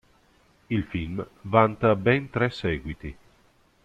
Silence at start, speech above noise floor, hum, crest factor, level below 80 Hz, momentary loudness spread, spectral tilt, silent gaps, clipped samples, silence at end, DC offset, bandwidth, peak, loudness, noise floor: 0.7 s; 37 dB; none; 24 dB; -48 dBFS; 15 LU; -8 dB/octave; none; under 0.1%; 0.7 s; under 0.1%; 8.8 kHz; -4 dBFS; -25 LUFS; -61 dBFS